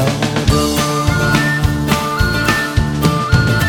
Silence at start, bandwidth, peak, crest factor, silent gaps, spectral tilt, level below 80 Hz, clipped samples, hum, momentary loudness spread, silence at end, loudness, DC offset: 0 s; over 20 kHz; 0 dBFS; 14 dB; none; -5 dB/octave; -26 dBFS; under 0.1%; none; 2 LU; 0 s; -15 LUFS; under 0.1%